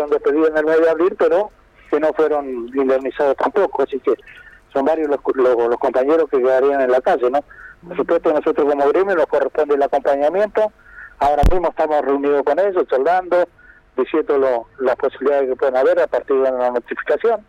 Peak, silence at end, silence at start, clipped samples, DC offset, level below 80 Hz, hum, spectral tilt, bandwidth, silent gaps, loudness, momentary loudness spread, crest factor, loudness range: -6 dBFS; 0.1 s; 0 s; under 0.1%; under 0.1%; -34 dBFS; none; -7 dB/octave; 9.8 kHz; none; -17 LUFS; 6 LU; 10 dB; 2 LU